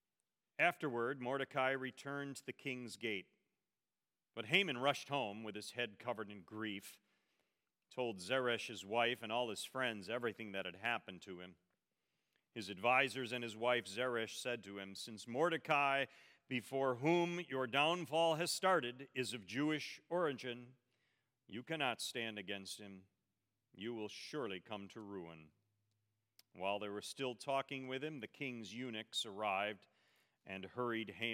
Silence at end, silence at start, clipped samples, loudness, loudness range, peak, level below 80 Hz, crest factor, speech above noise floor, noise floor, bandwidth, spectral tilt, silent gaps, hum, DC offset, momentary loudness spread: 0 s; 0.6 s; under 0.1%; -40 LUFS; 9 LU; -16 dBFS; under -90 dBFS; 26 dB; over 49 dB; under -90 dBFS; 16.5 kHz; -4 dB/octave; none; none; under 0.1%; 15 LU